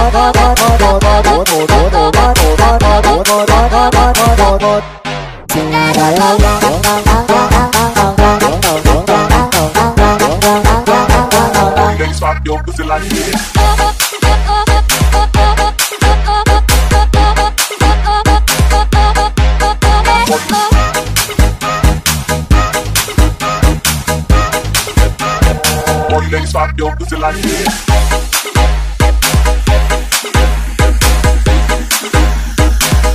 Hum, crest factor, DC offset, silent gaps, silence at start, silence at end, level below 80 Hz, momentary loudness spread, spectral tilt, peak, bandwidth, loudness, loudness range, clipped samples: none; 10 dB; under 0.1%; none; 0 s; 0 s; -14 dBFS; 5 LU; -4 dB/octave; 0 dBFS; 16 kHz; -10 LUFS; 4 LU; under 0.1%